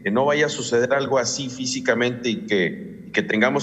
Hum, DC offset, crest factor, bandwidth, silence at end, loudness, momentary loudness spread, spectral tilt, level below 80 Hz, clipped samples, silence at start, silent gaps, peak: none; under 0.1%; 18 dB; 9.2 kHz; 0 s; -22 LUFS; 6 LU; -4 dB/octave; -62 dBFS; under 0.1%; 0 s; none; -4 dBFS